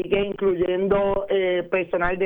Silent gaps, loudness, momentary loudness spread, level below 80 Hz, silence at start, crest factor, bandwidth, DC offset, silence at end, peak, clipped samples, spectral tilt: none; -22 LUFS; 3 LU; -42 dBFS; 0 s; 14 dB; 3.9 kHz; under 0.1%; 0 s; -8 dBFS; under 0.1%; -9 dB/octave